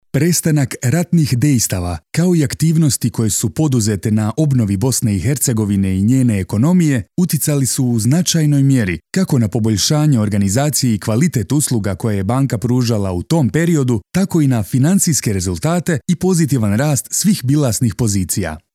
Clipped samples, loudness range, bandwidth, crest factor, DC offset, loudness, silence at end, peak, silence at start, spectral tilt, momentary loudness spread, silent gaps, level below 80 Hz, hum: under 0.1%; 1 LU; 16.5 kHz; 14 dB; under 0.1%; -15 LUFS; 0.15 s; -2 dBFS; 0.15 s; -5.5 dB/octave; 4 LU; none; -44 dBFS; none